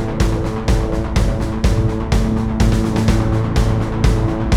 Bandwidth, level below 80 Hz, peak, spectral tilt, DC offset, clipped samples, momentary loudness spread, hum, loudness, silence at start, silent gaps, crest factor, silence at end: 14 kHz; -20 dBFS; -2 dBFS; -7 dB/octave; under 0.1%; under 0.1%; 3 LU; none; -18 LUFS; 0 s; none; 14 dB; 0 s